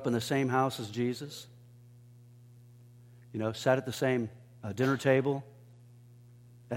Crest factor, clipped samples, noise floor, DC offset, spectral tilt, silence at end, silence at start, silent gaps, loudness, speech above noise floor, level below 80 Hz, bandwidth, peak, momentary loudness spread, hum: 22 dB; under 0.1%; -55 dBFS; under 0.1%; -6 dB/octave; 0 s; 0 s; none; -31 LUFS; 25 dB; -72 dBFS; 16.5 kHz; -12 dBFS; 17 LU; 60 Hz at -55 dBFS